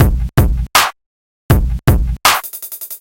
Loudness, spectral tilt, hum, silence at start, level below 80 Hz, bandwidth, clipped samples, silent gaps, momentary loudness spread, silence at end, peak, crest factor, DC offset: -14 LUFS; -4 dB/octave; none; 0 s; -18 dBFS; 17.5 kHz; under 0.1%; 1.06-1.49 s; 11 LU; 0.05 s; 0 dBFS; 14 dB; under 0.1%